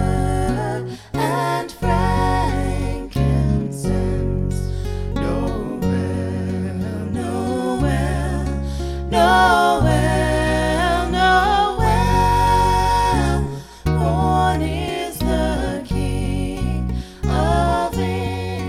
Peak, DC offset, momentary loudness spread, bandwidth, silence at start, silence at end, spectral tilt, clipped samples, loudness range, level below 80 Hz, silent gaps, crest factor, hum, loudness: -2 dBFS; under 0.1%; 9 LU; 16 kHz; 0 s; 0 s; -6 dB/octave; under 0.1%; 6 LU; -26 dBFS; none; 16 dB; none; -20 LUFS